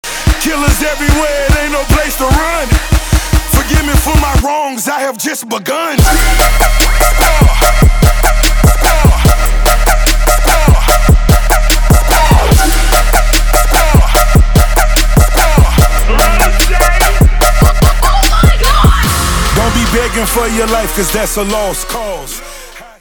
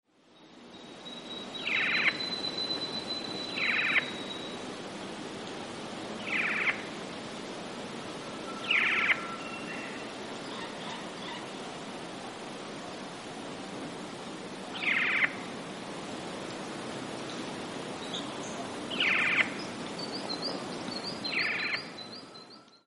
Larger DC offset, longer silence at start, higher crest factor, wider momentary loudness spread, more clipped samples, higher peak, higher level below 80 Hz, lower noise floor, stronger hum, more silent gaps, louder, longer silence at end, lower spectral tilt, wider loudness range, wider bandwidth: neither; second, 0.05 s vs 0.3 s; second, 8 dB vs 24 dB; second, 6 LU vs 15 LU; neither; first, 0 dBFS vs -10 dBFS; first, -10 dBFS vs -70 dBFS; second, -30 dBFS vs -58 dBFS; neither; neither; first, -10 LUFS vs -32 LUFS; about the same, 0.15 s vs 0.1 s; about the same, -4 dB/octave vs -3 dB/octave; second, 3 LU vs 9 LU; first, over 20 kHz vs 11.5 kHz